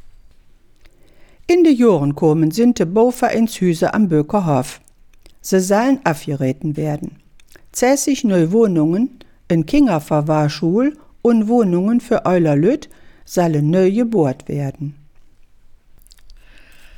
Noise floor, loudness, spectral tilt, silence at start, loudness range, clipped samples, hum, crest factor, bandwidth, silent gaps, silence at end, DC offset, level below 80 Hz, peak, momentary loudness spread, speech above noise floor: -47 dBFS; -16 LUFS; -6.5 dB/octave; 0.05 s; 4 LU; under 0.1%; none; 16 dB; 18 kHz; none; 0.65 s; under 0.1%; -44 dBFS; -2 dBFS; 9 LU; 32 dB